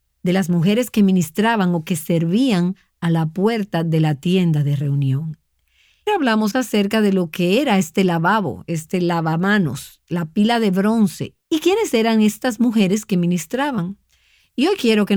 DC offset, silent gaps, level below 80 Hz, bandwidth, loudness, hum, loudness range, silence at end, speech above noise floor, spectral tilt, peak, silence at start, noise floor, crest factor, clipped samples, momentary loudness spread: under 0.1%; none; -58 dBFS; 19.5 kHz; -18 LUFS; none; 2 LU; 0 s; 43 dB; -6 dB/octave; -4 dBFS; 0.25 s; -60 dBFS; 14 dB; under 0.1%; 8 LU